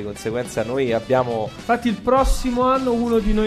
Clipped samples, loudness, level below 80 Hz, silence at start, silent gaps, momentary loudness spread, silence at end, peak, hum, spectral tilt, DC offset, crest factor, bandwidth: under 0.1%; -21 LUFS; -28 dBFS; 0 s; none; 6 LU; 0 s; -6 dBFS; none; -6 dB/octave; under 0.1%; 14 dB; 14 kHz